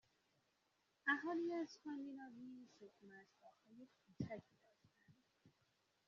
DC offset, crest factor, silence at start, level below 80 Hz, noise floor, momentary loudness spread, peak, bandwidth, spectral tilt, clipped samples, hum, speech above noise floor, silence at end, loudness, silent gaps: under 0.1%; 24 dB; 1.05 s; -88 dBFS; -84 dBFS; 24 LU; -28 dBFS; 7.2 kHz; -4 dB/octave; under 0.1%; none; 34 dB; 0.6 s; -47 LUFS; none